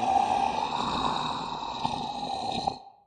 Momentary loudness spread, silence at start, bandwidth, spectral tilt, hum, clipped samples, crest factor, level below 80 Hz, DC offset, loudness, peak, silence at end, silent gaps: 8 LU; 0 s; 9.8 kHz; -4 dB/octave; none; under 0.1%; 18 dB; -54 dBFS; under 0.1%; -29 LUFS; -10 dBFS; 0.2 s; none